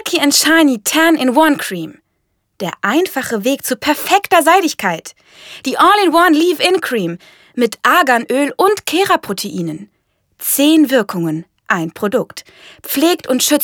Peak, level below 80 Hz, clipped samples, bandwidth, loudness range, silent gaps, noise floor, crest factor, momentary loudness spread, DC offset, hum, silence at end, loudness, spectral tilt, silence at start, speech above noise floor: 0 dBFS; -60 dBFS; under 0.1%; over 20 kHz; 3 LU; none; -67 dBFS; 14 dB; 15 LU; under 0.1%; none; 0 s; -13 LUFS; -3 dB/octave; 0.05 s; 53 dB